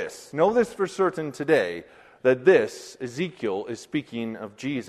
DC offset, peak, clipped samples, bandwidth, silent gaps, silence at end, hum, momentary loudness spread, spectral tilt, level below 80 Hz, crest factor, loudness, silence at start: under 0.1%; -6 dBFS; under 0.1%; 13 kHz; none; 0 s; none; 14 LU; -5.5 dB/octave; -66 dBFS; 20 dB; -25 LUFS; 0 s